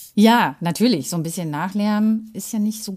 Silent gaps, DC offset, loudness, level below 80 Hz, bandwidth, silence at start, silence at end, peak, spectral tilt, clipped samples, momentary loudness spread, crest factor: none; under 0.1%; -20 LUFS; -66 dBFS; 15.5 kHz; 0 s; 0 s; -2 dBFS; -5 dB/octave; under 0.1%; 10 LU; 16 dB